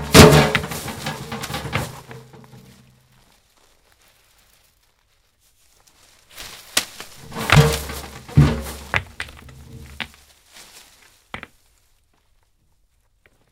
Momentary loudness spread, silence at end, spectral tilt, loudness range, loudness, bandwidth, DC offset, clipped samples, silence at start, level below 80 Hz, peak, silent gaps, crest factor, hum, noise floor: 25 LU; 2.15 s; -4.5 dB/octave; 19 LU; -18 LUFS; 17.5 kHz; under 0.1%; under 0.1%; 0 s; -36 dBFS; 0 dBFS; none; 22 dB; none; -62 dBFS